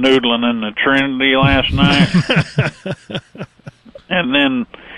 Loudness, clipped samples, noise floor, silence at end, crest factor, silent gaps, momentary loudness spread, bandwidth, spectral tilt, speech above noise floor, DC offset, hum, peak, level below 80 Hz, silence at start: -14 LUFS; under 0.1%; -39 dBFS; 0 s; 14 dB; none; 16 LU; 11 kHz; -6 dB/octave; 24 dB; under 0.1%; none; 0 dBFS; -34 dBFS; 0 s